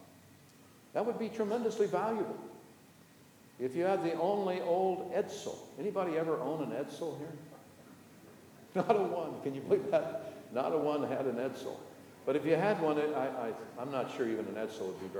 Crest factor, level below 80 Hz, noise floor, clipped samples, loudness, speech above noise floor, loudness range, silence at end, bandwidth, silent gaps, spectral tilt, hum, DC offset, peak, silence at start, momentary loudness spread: 22 dB; -82 dBFS; -60 dBFS; under 0.1%; -35 LUFS; 26 dB; 4 LU; 0 s; over 20 kHz; none; -6 dB/octave; none; under 0.1%; -14 dBFS; 0 s; 13 LU